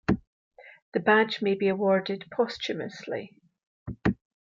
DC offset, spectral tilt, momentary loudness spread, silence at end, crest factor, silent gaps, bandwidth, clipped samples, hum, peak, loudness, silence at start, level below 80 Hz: under 0.1%; -6.5 dB/octave; 14 LU; 0.35 s; 20 dB; 0.27-0.51 s, 0.82-0.92 s, 3.67-3.86 s; 7.6 kHz; under 0.1%; none; -8 dBFS; -27 LUFS; 0.1 s; -52 dBFS